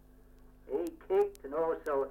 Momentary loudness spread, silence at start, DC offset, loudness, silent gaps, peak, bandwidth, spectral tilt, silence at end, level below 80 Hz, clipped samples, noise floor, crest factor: 6 LU; 0.45 s; under 0.1%; -34 LUFS; none; -18 dBFS; 16 kHz; -6 dB/octave; 0 s; -58 dBFS; under 0.1%; -57 dBFS; 16 dB